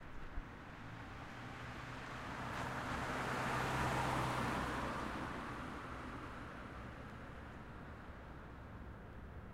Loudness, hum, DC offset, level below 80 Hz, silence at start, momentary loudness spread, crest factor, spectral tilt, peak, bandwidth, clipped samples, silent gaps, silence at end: -44 LUFS; none; under 0.1%; -56 dBFS; 0 s; 15 LU; 18 dB; -5 dB/octave; -26 dBFS; 16.5 kHz; under 0.1%; none; 0 s